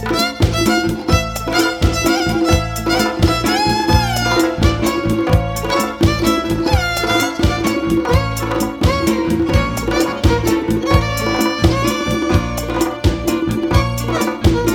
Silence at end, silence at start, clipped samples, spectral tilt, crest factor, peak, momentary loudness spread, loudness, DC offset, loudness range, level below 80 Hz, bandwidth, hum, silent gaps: 0 s; 0 s; under 0.1%; -5 dB/octave; 16 dB; 0 dBFS; 3 LU; -16 LUFS; under 0.1%; 1 LU; -24 dBFS; 19 kHz; none; none